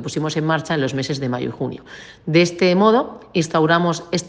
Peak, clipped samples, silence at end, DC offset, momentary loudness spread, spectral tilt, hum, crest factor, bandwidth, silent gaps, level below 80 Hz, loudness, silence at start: -2 dBFS; under 0.1%; 0 s; under 0.1%; 13 LU; -5.5 dB/octave; none; 18 dB; 9.8 kHz; none; -56 dBFS; -19 LUFS; 0 s